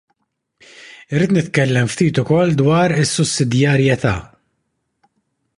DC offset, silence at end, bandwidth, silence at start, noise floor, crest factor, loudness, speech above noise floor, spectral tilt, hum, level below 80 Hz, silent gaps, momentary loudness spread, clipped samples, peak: under 0.1%; 1.35 s; 11.5 kHz; 0.8 s; -71 dBFS; 16 dB; -16 LUFS; 56 dB; -5.5 dB/octave; none; -46 dBFS; none; 5 LU; under 0.1%; 0 dBFS